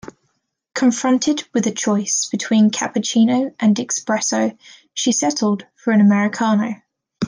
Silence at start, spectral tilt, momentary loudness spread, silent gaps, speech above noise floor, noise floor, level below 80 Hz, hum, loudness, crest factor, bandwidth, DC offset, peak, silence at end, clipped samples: 0.05 s; -4 dB/octave; 7 LU; none; 52 dB; -69 dBFS; -66 dBFS; none; -18 LUFS; 14 dB; 10.5 kHz; under 0.1%; -6 dBFS; 0 s; under 0.1%